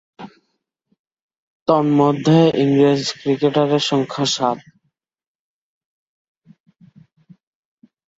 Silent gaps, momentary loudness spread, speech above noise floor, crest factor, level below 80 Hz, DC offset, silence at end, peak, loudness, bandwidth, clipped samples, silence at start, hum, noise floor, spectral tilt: 0.99-1.05 s, 1.22-1.29 s, 1.37-1.66 s; 7 LU; 56 dB; 18 dB; -62 dBFS; under 0.1%; 3.65 s; -2 dBFS; -17 LUFS; 8 kHz; under 0.1%; 0.2 s; none; -72 dBFS; -6 dB/octave